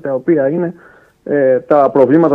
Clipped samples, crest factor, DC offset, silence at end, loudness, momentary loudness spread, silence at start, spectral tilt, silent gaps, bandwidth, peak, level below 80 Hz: under 0.1%; 12 dB; under 0.1%; 0 s; -13 LUFS; 11 LU; 0.05 s; -10.5 dB/octave; none; 4.4 kHz; 0 dBFS; -60 dBFS